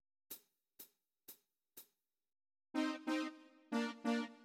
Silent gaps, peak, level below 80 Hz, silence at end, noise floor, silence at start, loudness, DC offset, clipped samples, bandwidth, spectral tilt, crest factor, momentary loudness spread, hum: none; -26 dBFS; under -90 dBFS; 0 s; -78 dBFS; 0.3 s; -42 LUFS; under 0.1%; under 0.1%; 16.5 kHz; -3.5 dB/octave; 20 dB; 21 LU; none